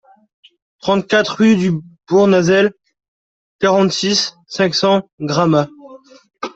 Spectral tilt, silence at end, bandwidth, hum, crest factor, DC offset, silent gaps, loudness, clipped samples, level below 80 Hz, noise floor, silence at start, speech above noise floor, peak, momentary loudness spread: -5 dB/octave; 0.05 s; 8 kHz; none; 14 dB; under 0.1%; 3.08-3.59 s, 5.13-5.18 s; -15 LUFS; under 0.1%; -56 dBFS; -40 dBFS; 0.85 s; 26 dB; -2 dBFS; 9 LU